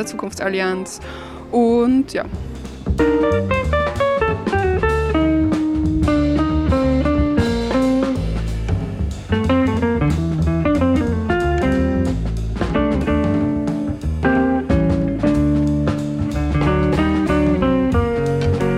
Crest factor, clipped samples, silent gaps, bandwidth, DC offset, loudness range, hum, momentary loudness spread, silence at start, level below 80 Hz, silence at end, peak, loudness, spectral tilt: 12 dB; under 0.1%; none; 12.5 kHz; under 0.1%; 2 LU; none; 7 LU; 0 s; -26 dBFS; 0 s; -6 dBFS; -18 LUFS; -7.5 dB/octave